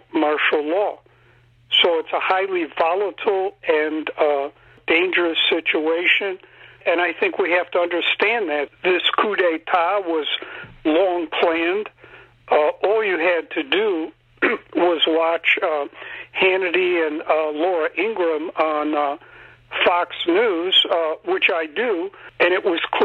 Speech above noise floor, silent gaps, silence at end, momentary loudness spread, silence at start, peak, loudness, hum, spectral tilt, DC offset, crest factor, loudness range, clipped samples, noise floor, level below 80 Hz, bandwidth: 34 dB; none; 0 s; 8 LU; 0.15 s; -6 dBFS; -19 LUFS; none; -5 dB/octave; under 0.1%; 14 dB; 2 LU; under 0.1%; -54 dBFS; -64 dBFS; 7.4 kHz